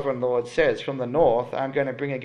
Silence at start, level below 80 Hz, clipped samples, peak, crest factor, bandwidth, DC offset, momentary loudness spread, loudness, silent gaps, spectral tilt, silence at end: 0 s; -54 dBFS; under 0.1%; -6 dBFS; 16 dB; 10 kHz; under 0.1%; 6 LU; -24 LUFS; none; -6.5 dB/octave; 0 s